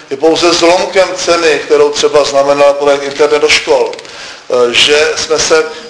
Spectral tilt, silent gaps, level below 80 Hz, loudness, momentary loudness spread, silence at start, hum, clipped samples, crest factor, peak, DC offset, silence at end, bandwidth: -2 dB/octave; none; -44 dBFS; -9 LUFS; 5 LU; 0 s; none; 0.6%; 10 dB; 0 dBFS; under 0.1%; 0 s; 11 kHz